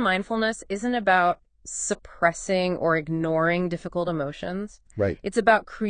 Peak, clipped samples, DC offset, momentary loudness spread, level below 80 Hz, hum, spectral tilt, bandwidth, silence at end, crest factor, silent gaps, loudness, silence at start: -6 dBFS; under 0.1%; under 0.1%; 11 LU; -52 dBFS; none; -4.5 dB/octave; 10 kHz; 0 s; 20 dB; none; -25 LUFS; 0 s